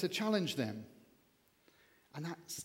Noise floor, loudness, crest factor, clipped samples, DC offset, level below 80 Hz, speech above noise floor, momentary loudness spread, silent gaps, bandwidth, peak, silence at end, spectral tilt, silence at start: -72 dBFS; -38 LUFS; 22 dB; under 0.1%; under 0.1%; -84 dBFS; 34 dB; 18 LU; none; 17 kHz; -20 dBFS; 0 s; -4.5 dB/octave; 0 s